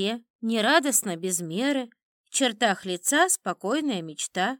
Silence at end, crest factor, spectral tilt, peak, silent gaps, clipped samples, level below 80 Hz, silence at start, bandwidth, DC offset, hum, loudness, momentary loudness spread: 0.05 s; 20 dB; -2.5 dB/octave; -6 dBFS; 0.30-0.39 s, 2.03-2.24 s; under 0.1%; -84 dBFS; 0 s; 19 kHz; under 0.1%; none; -25 LUFS; 9 LU